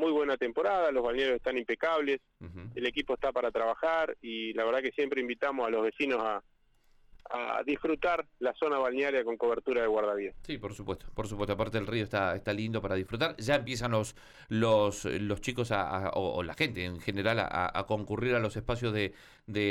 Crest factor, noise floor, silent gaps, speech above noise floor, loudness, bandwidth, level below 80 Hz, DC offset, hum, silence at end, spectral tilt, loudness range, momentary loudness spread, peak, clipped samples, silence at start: 16 dB; -64 dBFS; none; 33 dB; -32 LUFS; 14 kHz; -54 dBFS; under 0.1%; none; 0 s; -5.5 dB/octave; 2 LU; 8 LU; -16 dBFS; under 0.1%; 0 s